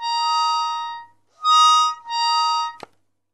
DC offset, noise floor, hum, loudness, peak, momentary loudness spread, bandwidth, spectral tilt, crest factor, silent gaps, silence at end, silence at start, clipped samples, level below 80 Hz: 0.1%; -46 dBFS; none; -18 LUFS; -6 dBFS; 15 LU; 12 kHz; 3 dB/octave; 16 dB; none; 0.55 s; 0 s; under 0.1%; -76 dBFS